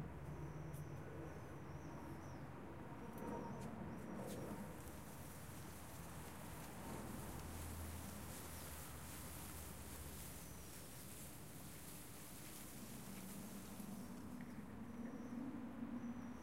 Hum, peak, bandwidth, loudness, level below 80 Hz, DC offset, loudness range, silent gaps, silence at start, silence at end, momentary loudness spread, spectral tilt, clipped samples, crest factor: none; -36 dBFS; 16 kHz; -52 LUFS; -64 dBFS; under 0.1%; 2 LU; none; 0 s; 0 s; 5 LU; -5 dB/octave; under 0.1%; 16 dB